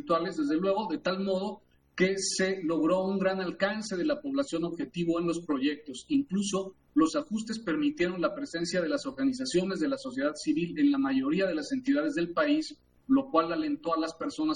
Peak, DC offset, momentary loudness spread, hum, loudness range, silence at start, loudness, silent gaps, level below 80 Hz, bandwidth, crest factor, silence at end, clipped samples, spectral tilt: -12 dBFS; under 0.1%; 6 LU; none; 2 LU; 0 s; -30 LUFS; none; -64 dBFS; 11 kHz; 18 dB; 0 s; under 0.1%; -5 dB/octave